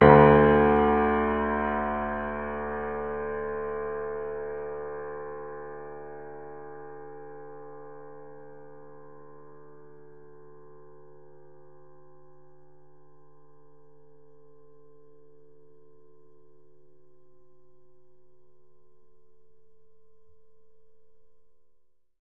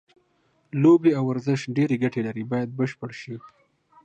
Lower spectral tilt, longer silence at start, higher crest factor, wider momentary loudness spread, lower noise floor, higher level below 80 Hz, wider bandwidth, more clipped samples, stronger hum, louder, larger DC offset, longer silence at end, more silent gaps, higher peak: first, -10.5 dB/octave vs -8 dB/octave; second, 0 s vs 0.75 s; first, 28 dB vs 18 dB; first, 28 LU vs 18 LU; about the same, -67 dBFS vs -66 dBFS; first, -48 dBFS vs -70 dBFS; second, 4.2 kHz vs 8.2 kHz; neither; neither; about the same, -25 LUFS vs -23 LUFS; first, 0.5% vs under 0.1%; second, 0 s vs 0.55 s; neither; first, -2 dBFS vs -6 dBFS